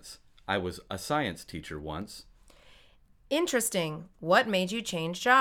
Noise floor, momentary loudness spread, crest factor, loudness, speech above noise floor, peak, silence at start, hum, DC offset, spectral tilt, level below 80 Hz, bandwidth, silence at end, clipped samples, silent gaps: -59 dBFS; 16 LU; 22 dB; -30 LUFS; 30 dB; -8 dBFS; 0.05 s; none; under 0.1%; -3.5 dB/octave; -58 dBFS; 19.5 kHz; 0 s; under 0.1%; none